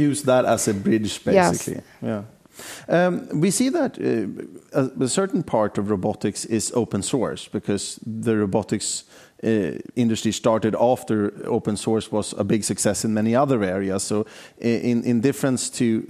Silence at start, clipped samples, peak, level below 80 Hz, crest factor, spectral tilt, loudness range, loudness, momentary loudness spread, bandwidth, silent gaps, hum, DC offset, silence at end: 0 s; under 0.1%; -4 dBFS; -58 dBFS; 18 dB; -5 dB/octave; 2 LU; -22 LUFS; 9 LU; 15.5 kHz; none; none; under 0.1%; 0.05 s